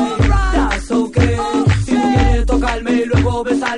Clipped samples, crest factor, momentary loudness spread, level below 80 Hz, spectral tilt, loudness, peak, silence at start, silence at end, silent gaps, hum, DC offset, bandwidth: under 0.1%; 14 dB; 3 LU; -20 dBFS; -6.5 dB/octave; -16 LUFS; 0 dBFS; 0 s; 0 s; none; none; under 0.1%; 10.5 kHz